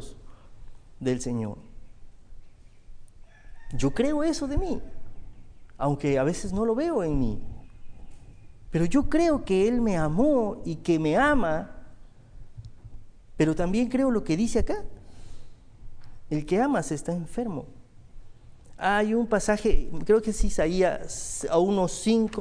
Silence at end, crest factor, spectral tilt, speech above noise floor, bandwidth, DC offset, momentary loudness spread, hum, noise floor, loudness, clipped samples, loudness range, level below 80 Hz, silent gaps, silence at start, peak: 0 s; 18 dB; -6 dB/octave; 22 dB; 10.5 kHz; under 0.1%; 11 LU; none; -46 dBFS; -26 LUFS; under 0.1%; 6 LU; -36 dBFS; none; 0 s; -8 dBFS